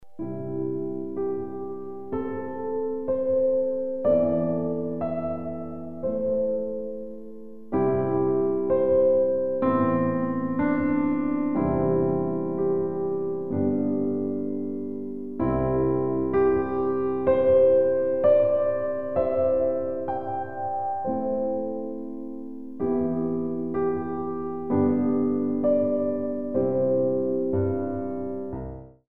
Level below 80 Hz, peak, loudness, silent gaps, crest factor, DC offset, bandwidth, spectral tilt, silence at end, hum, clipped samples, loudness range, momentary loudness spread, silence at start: -52 dBFS; -10 dBFS; -25 LUFS; none; 16 dB; 0.9%; 3.7 kHz; -11.5 dB/octave; 0.05 s; none; under 0.1%; 7 LU; 11 LU; 0 s